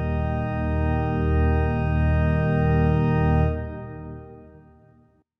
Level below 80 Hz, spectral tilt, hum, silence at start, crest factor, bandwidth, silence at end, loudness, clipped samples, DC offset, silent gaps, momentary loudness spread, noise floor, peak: -28 dBFS; -10.5 dB/octave; none; 0 s; 14 dB; 5.2 kHz; 0.9 s; -23 LUFS; under 0.1%; under 0.1%; none; 15 LU; -58 dBFS; -10 dBFS